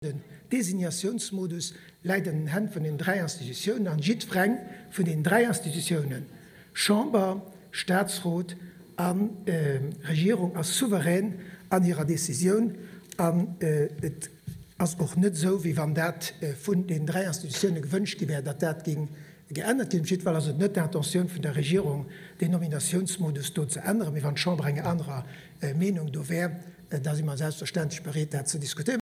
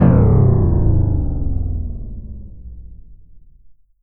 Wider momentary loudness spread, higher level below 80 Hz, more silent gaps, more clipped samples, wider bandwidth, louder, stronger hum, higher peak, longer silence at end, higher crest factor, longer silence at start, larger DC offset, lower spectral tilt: second, 11 LU vs 25 LU; second, -66 dBFS vs -22 dBFS; neither; neither; first, 16 kHz vs 2.8 kHz; second, -28 LUFS vs -17 LUFS; neither; second, -8 dBFS vs 0 dBFS; second, 0.05 s vs 0.2 s; about the same, 20 dB vs 16 dB; about the same, 0 s vs 0 s; neither; second, -5 dB/octave vs -15 dB/octave